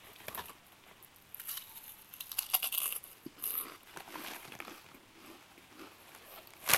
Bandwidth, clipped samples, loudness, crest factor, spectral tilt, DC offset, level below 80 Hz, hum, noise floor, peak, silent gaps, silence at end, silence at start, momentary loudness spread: 16.5 kHz; under 0.1%; -38 LUFS; 36 dB; 0 dB/octave; under 0.1%; -76 dBFS; none; -59 dBFS; -6 dBFS; none; 0 s; 0 s; 23 LU